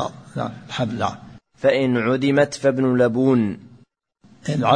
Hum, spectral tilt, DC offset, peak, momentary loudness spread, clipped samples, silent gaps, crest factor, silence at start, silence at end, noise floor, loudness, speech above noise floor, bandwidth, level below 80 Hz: none; -6.5 dB/octave; under 0.1%; -2 dBFS; 11 LU; under 0.1%; none; 18 dB; 0 s; 0 s; -55 dBFS; -20 LUFS; 36 dB; 10 kHz; -58 dBFS